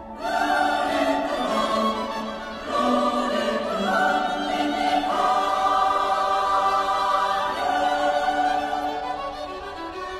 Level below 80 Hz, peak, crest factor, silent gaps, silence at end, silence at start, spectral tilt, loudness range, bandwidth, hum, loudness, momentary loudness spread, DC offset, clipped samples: -50 dBFS; -8 dBFS; 14 dB; none; 0 s; 0 s; -3.5 dB/octave; 2 LU; 15 kHz; none; -23 LUFS; 9 LU; under 0.1%; under 0.1%